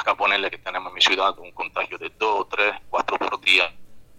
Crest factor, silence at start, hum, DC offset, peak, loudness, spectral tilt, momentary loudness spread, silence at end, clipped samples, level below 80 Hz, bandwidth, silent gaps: 22 dB; 0 s; none; under 0.1%; -2 dBFS; -21 LUFS; -1 dB/octave; 12 LU; 0 s; under 0.1%; -60 dBFS; 16 kHz; none